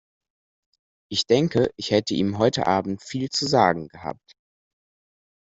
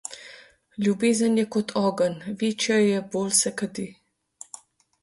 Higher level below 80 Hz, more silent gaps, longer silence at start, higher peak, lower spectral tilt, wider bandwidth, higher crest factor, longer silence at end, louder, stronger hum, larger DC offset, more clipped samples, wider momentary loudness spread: first, -58 dBFS vs -68 dBFS; neither; first, 1.1 s vs 0.1 s; first, -2 dBFS vs -8 dBFS; about the same, -5 dB/octave vs -4 dB/octave; second, 8.2 kHz vs 12 kHz; first, 22 dB vs 16 dB; first, 1.25 s vs 1.1 s; about the same, -22 LUFS vs -24 LUFS; neither; neither; neither; second, 10 LU vs 21 LU